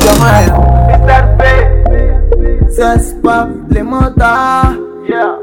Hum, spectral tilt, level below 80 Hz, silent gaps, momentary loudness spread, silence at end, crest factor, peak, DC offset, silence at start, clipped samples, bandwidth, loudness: none; -6 dB/octave; -10 dBFS; none; 7 LU; 0 s; 8 dB; 0 dBFS; under 0.1%; 0 s; 1%; 17.5 kHz; -10 LUFS